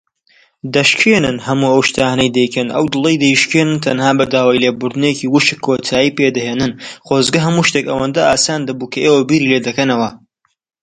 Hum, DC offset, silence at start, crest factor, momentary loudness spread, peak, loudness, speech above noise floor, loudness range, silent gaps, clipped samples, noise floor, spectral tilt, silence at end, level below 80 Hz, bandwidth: none; under 0.1%; 0.65 s; 14 dB; 7 LU; 0 dBFS; -13 LUFS; 44 dB; 2 LU; none; under 0.1%; -57 dBFS; -4.5 dB/octave; 0.65 s; -48 dBFS; 11 kHz